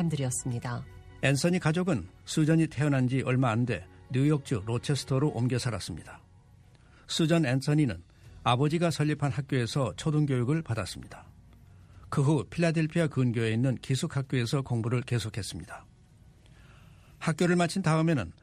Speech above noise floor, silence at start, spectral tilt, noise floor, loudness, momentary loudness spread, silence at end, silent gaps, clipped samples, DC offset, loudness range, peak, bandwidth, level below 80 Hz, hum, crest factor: 29 dB; 0 s; -6 dB/octave; -56 dBFS; -29 LUFS; 10 LU; 0.1 s; none; under 0.1%; under 0.1%; 4 LU; -10 dBFS; 13.5 kHz; -56 dBFS; none; 18 dB